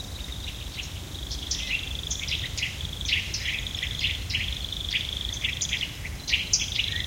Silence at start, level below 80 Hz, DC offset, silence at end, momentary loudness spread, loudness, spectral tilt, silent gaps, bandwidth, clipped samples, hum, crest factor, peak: 0 s; -38 dBFS; under 0.1%; 0 s; 10 LU; -28 LUFS; -1.5 dB/octave; none; 17 kHz; under 0.1%; none; 22 dB; -8 dBFS